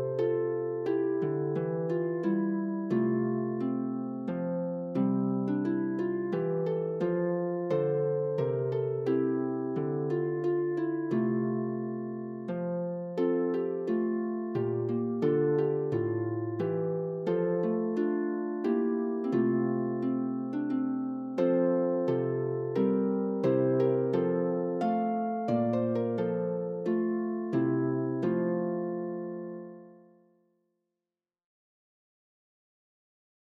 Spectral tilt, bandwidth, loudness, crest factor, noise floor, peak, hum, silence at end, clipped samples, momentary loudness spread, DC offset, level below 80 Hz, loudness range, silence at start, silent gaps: -10.5 dB/octave; 5.8 kHz; -30 LUFS; 14 dB; under -90 dBFS; -16 dBFS; none; 3.5 s; under 0.1%; 5 LU; under 0.1%; -78 dBFS; 3 LU; 0 s; none